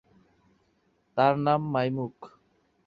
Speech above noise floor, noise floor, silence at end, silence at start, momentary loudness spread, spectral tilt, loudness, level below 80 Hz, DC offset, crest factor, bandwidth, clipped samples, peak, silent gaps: 44 dB; -70 dBFS; 0.6 s; 1.15 s; 12 LU; -9 dB/octave; -27 LUFS; -68 dBFS; under 0.1%; 22 dB; 6.6 kHz; under 0.1%; -8 dBFS; none